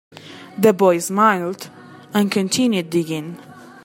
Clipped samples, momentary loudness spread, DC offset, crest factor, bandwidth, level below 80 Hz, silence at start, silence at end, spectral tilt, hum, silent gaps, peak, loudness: under 0.1%; 21 LU; under 0.1%; 18 dB; 16.5 kHz; -68 dBFS; 0.15 s; 0.05 s; -5 dB/octave; none; none; 0 dBFS; -18 LUFS